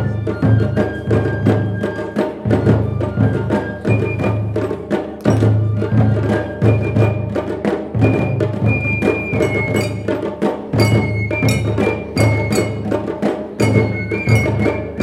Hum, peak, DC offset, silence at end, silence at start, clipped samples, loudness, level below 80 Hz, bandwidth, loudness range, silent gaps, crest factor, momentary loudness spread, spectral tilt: none; 0 dBFS; under 0.1%; 0 s; 0 s; under 0.1%; -17 LUFS; -34 dBFS; 13 kHz; 1 LU; none; 16 dB; 6 LU; -7.5 dB/octave